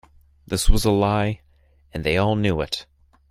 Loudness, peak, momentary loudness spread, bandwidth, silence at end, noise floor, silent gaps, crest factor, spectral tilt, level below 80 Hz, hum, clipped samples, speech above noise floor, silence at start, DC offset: -22 LUFS; -2 dBFS; 10 LU; 15.5 kHz; 0.5 s; -56 dBFS; none; 20 dB; -5 dB/octave; -28 dBFS; none; under 0.1%; 37 dB; 0.5 s; under 0.1%